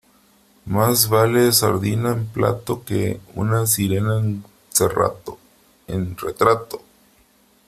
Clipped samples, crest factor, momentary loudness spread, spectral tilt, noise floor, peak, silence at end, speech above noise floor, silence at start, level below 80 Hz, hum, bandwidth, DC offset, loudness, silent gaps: under 0.1%; 20 dB; 12 LU; -4.5 dB/octave; -57 dBFS; -2 dBFS; 0.9 s; 37 dB; 0.65 s; -50 dBFS; none; 16 kHz; under 0.1%; -19 LUFS; none